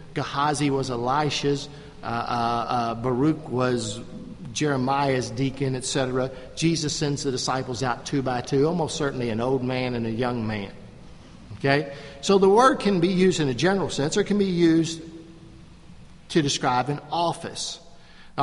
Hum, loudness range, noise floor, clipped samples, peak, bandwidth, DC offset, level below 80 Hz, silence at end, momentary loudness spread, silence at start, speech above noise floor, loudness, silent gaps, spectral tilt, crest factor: none; 5 LU; -46 dBFS; under 0.1%; -4 dBFS; 11.5 kHz; under 0.1%; -50 dBFS; 0 s; 11 LU; 0 s; 22 dB; -24 LUFS; none; -5 dB/octave; 20 dB